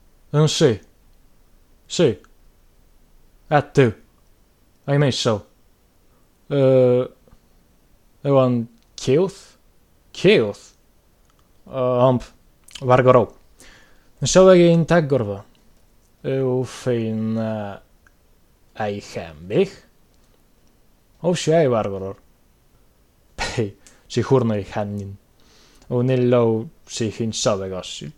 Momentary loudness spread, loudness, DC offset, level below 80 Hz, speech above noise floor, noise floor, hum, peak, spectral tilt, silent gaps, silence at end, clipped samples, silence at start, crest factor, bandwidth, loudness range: 16 LU; -20 LUFS; under 0.1%; -50 dBFS; 38 dB; -56 dBFS; none; 0 dBFS; -6 dB/octave; none; 0.05 s; under 0.1%; 0.35 s; 22 dB; 12.5 kHz; 9 LU